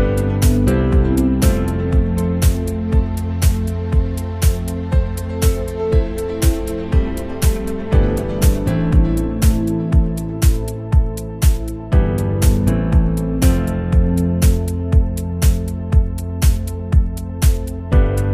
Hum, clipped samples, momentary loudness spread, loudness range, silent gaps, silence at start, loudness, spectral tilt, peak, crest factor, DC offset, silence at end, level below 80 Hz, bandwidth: none; under 0.1%; 6 LU; 2 LU; none; 0 s; -18 LUFS; -6.5 dB/octave; -2 dBFS; 14 dB; under 0.1%; 0 s; -18 dBFS; 16 kHz